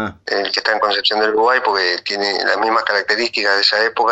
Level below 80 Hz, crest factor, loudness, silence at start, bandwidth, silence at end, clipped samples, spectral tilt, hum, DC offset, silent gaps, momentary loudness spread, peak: -58 dBFS; 16 dB; -15 LUFS; 0 s; 8.2 kHz; 0 s; under 0.1%; -2 dB/octave; none; under 0.1%; none; 5 LU; 0 dBFS